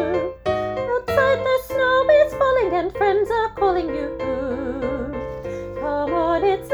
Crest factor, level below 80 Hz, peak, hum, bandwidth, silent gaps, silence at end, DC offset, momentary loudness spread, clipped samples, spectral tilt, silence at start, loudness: 16 dB; -42 dBFS; -4 dBFS; none; over 20 kHz; none; 0 s; under 0.1%; 10 LU; under 0.1%; -6 dB/octave; 0 s; -21 LUFS